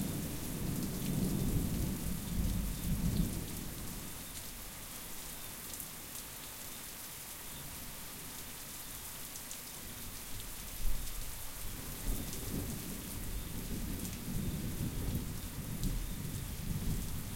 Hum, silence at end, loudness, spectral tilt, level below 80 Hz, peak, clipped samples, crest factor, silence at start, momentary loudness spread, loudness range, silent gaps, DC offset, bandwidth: none; 0 s; -40 LUFS; -4.5 dB/octave; -44 dBFS; -20 dBFS; under 0.1%; 18 dB; 0 s; 8 LU; 7 LU; none; under 0.1%; 17 kHz